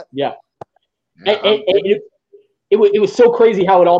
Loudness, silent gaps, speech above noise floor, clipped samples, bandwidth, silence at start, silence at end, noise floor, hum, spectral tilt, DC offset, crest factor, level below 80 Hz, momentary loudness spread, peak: -14 LUFS; none; 53 dB; under 0.1%; 7.8 kHz; 0 s; 0 s; -65 dBFS; none; -5.5 dB/octave; under 0.1%; 14 dB; -62 dBFS; 12 LU; 0 dBFS